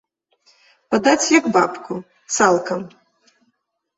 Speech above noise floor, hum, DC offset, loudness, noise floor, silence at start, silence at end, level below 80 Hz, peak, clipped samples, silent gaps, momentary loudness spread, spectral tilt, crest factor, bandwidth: 53 dB; none; under 0.1%; -17 LUFS; -70 dBFS; 0.9 s; 1.1 s; -64 dBFS; -2 dBFS; under 0.1%; none; 16 LU; -3 dB/octave; 20 dB; 8.2 kHz